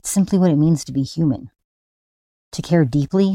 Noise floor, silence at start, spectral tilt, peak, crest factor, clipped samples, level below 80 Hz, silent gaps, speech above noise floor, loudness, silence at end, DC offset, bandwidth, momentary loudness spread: under -90 dBFS; 0.05 s; -6.5 dB/octave; -4 dBFS; 14 dB; under 0.1%; -50 dBFS; 1.64-2.51 s; over 73 dB; -18 LUFS; 0 s; under 0.1%; 16 kHz; 12 LU